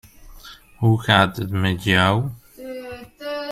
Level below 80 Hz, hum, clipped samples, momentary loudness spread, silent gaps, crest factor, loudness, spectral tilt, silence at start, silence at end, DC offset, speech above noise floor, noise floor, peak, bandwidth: -48 dBFS; none; under 0.1%; 18 LU; none; 20 dB; -19 LUFS; -6 dB/octave; 0.2 s; 0 s; under 0.1%; 25 dB; -43 dBFS; -2 dBFS; 15 kHz